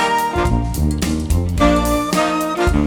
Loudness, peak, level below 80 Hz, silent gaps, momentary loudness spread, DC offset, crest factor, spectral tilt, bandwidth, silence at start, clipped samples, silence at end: -17 LUFS; -2 dBFS; -22 dBFS; none; 4 LU; under 0.1%; 14 dB; -5.5 dB/octave; over 20 kHz; 0 s; under 0.1%; 0 s